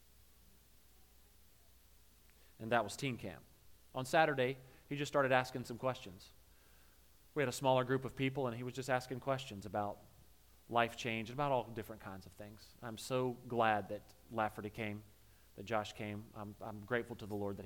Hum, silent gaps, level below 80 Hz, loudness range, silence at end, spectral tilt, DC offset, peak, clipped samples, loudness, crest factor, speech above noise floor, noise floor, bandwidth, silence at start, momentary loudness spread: none; none; -68 dBFS; 6 LU; 0 s; -5 dB/octave; under 0.1%; -16 dBFS; under 0.1%; -39 LUFS; 24 dB; 28 dB; -67 dBFS; 18 kHz; 2.6 s; 17 LU